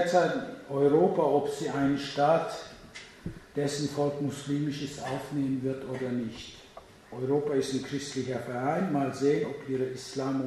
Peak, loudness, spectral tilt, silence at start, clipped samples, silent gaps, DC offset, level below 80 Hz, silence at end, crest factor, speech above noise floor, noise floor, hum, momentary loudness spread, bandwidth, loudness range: -12 dBFS; -30 LUFS; -6 dB/octave; 0 s; under 0.1%; none; under 0.1%; -62 dBFS; 0 s; 18 dB; 22 dB; -51 dBFS; none; 16 LU; 13.5 kHz; 5 LU